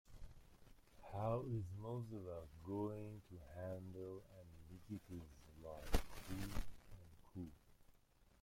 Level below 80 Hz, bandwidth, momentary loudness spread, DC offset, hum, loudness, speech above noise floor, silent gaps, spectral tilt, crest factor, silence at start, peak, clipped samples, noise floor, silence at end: -56 dBFS; 16.5 kHz; 19 LU; under 0.1%; none; -50 LUFS; 26 dB; none; -6.5 dB/octave; 28 dB; 0.05 s; -20 dBFS; under 0.1%; -72 dBFS; 0.15 s